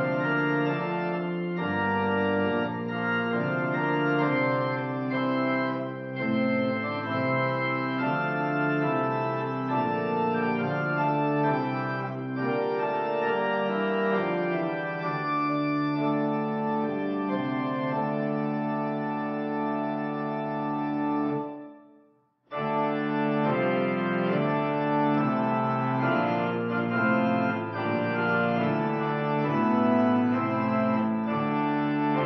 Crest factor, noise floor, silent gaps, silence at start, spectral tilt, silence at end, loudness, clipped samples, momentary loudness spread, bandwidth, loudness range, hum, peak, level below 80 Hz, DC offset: 14 dB; -63 dBFS; none; 0 s; -5.5 dB/octave; 0 s; -27 LUFS; under 0.1%; 5 LU; 6 kHz; 4 LU; none; -12 dBFS; -72 dBFS; under 0.1%